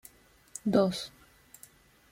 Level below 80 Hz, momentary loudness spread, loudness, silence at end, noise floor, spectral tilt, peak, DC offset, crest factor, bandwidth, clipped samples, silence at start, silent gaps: -66 dBFS; 26 LU; -29 LUFS; 1.05 s; -58 dBFS; -5.5 dB/octave; -10 dBFS; under 0.1%; 22 dB; 16.5 kHz; under 0.1%; 0.65 s; none